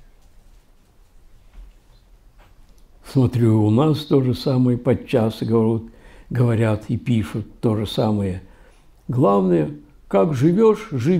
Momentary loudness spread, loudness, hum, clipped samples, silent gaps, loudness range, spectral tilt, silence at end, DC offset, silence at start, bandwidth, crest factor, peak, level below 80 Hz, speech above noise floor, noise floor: 11 LU; -19 LUFS; none; under 0.1%; none; 4 LU; -8.5 dB/octave; 0 s; under 0.1%; 1.55 s; 14 kHz; 14 dB; -6 dBFS; -46 dBFS; 34 dB; -52 dBFS